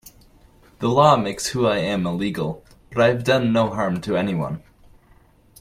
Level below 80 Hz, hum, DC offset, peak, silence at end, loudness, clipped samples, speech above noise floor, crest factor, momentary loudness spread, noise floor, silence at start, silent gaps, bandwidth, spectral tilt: -50 dBFS; none; under 0.1%; -2 dBFS; 1.05 s; -21 LUFS; under 0.1%; 34 dB; 20 dB; 13 LU; -54 dBFS; 0.8 s; none; 16 kHz; -5.5 dB/octave